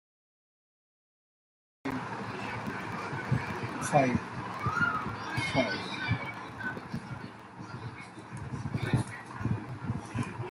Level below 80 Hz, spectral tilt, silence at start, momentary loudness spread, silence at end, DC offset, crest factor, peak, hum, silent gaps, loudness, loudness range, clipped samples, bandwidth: -58 dBFS; -6 dB/octave; 1.85 s; 13 LU; 0 s; under 0.1%; 24 dB; -12 dBFS; none; none; -34 LUFS; 7 LU; under 0.1%; 13.5 kHz